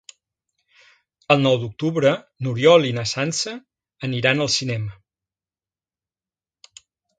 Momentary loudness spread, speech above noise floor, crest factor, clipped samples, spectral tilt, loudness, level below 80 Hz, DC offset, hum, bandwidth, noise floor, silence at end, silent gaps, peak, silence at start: 14 LU; over 70 dB; 22 dB; under 0.1%; -4.5 dB/octave; -20 LUFS; -60 dBFS; under 0.1%; none; 9.4 kHz; under -90 dBFS; 2.3 s; none; 0 dBFS; 1.3 s